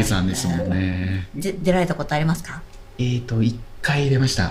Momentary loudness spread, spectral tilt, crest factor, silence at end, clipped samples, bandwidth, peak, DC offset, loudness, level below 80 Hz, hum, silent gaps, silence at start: 8 LU; -5.5 dB/octave; 16 dB; 0 s; under 0.1%; 16 kHz; -6 dBFS; under 0.1%; -22 LUFS; -38 dBFS; none; none; 0 s